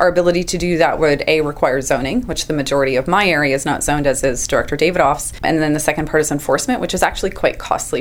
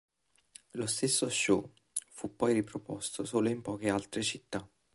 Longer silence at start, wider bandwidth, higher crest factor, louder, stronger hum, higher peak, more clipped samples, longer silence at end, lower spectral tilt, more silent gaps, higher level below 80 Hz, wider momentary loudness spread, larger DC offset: second, 0 s vs 0.75 s; first, over 20 kHz vs 12 kHz; about the same, 16 dB vs 20 dB; first, -16 LUFS vs -33 LUFS; neither; first, 0 dBFS vs -14 dBFS; neither; second, 0 s vs 0.3 s; about the same, -4 dB/octave vs -3.5 dB/octave; neither; first, -34 dBFS vs -66 dBFS; second, 5 LU vs 11 LU; neither